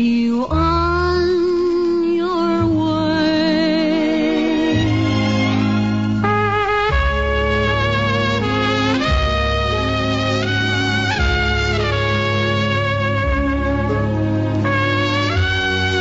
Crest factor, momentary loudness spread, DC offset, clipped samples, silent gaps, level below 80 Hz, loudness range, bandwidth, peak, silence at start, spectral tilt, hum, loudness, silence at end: 14 dB; 2 LU; 0.6%; under 0.1%; none; -28 dBFS; 1 LU; 8 kHz; -4 dBFS; 0 s; -6 dB/octave; none; -17 LUFS; 0 s